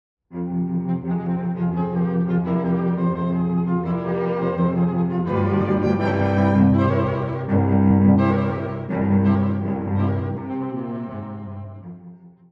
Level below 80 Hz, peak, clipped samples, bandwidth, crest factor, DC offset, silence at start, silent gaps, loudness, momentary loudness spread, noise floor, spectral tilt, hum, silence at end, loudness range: -48 dBFS; -4 dBFS; under 0.1%; 5 kHz; 16 dB; under 0.1%; 0.3 s; none; -21 LUFS; 14 LU; -44 dBFS; -10.5 dB/octave; none; 0.25 s; 5 LU